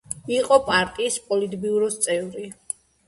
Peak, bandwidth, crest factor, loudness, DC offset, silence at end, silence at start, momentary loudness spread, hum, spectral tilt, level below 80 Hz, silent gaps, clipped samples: -2 dBFS; 12 kHz; 20 dB; -22 LUFS; under 0.1%; 0.55 s; 0.1 s; 15 LU; none; -2.5 dB/octave; -56 dBFS; none; under 0.1%